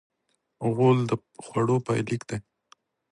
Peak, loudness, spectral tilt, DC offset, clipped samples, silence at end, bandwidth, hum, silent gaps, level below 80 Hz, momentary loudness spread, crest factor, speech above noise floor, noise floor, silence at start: -8 dBFS; -26 LUFS; -7.5 dB/octave; under 0.1%; under 0.1%; 0.7 s; 11.5 kHz; none; none; -62 dBFS; 11 LU; 18 dB; 51 dB; -76 dBFS; 0.6 s